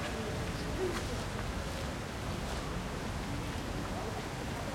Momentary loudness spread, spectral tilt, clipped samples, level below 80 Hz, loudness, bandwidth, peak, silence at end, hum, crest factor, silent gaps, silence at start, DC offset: 3 LU; -5 dB/octave; under 0.1%; -44 dBFS; -38 LUFS; 16.5 kHz; -22 dBFS; 0 s; none; 14 dB; none; 0 s; under 0.1%